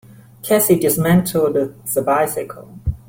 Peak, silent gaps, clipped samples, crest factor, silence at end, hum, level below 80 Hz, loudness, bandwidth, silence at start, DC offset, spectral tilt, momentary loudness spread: -2 dBFS; none; under 0.1%; 16 dB; 0.1 s; none; -38 dBFS; -17 LUFS; 17 kHz; 0.45 s; under 0.1%; -5.5 dB/octave; 13 LU